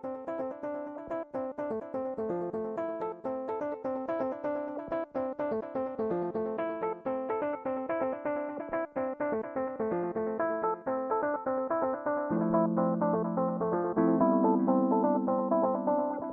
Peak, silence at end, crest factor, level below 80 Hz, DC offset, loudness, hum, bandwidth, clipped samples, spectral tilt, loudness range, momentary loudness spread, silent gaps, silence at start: -14 dBFS; 0 s; 18 dB; -68 dBFS; under 0.1%; -32 LUFS; none; 3.9 kHz; under 0.1%; -11 dB/octave; 7 LU; 9 LU; none; 0.05 s